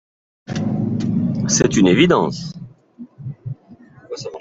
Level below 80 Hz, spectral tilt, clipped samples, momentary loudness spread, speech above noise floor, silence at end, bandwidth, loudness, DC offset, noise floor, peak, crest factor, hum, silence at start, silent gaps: -48 dBFS; -5 dB/octave; under 0.1%; 20 LU; 30 dB; 0 s; 8 kHz; -17 LUFS; under 0.1%; -45 dBFS; -2 dBFS; 18 dB; none; 0.5 s; none